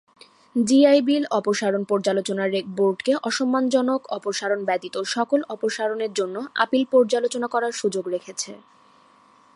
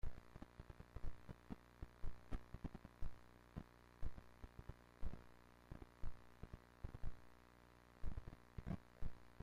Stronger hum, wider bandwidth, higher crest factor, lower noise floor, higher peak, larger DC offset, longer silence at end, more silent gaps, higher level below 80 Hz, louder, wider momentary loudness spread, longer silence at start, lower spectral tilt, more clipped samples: second, none vs 60 Hz at -70 dBFS; first, 11.5 kHz vs 6.4 kHz; about the same, 20 dB vs 16 dB; second, -55 dBFS vs -67 dBFS; first, -4 dBFS vs -32 dBFS; neither; first, 1 s vs 0.1 s; neither; second, -76 dBFS vs -54 dBFS; first, -22 LUFS vs -58 LUFS; about the same, 8 LU vs 10 LU; first, 0.55 s vs 0.05 s; second, -4 dB/octave vs -7.5 dB/octave; neither